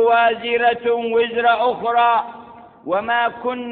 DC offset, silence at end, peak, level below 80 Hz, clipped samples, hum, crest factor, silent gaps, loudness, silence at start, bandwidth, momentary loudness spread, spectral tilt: under 0.1%; 0 s; -4 dBFS; -62 dBFS; under 0.1%; none; 14 dB; none; -18 LUFS; 0 s; 4.5 kHz; 8 LU; -8.5 dB/octave